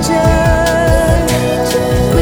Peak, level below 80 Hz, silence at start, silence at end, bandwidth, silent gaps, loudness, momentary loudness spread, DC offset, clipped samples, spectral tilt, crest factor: 0 dBFS; -18 dBFS; 0 s; 0 s; over 20 kHz; none; -12 LUFS; 3 LU; under 0.1%; under 0.1%; -5.5 dB/octave; 10 dB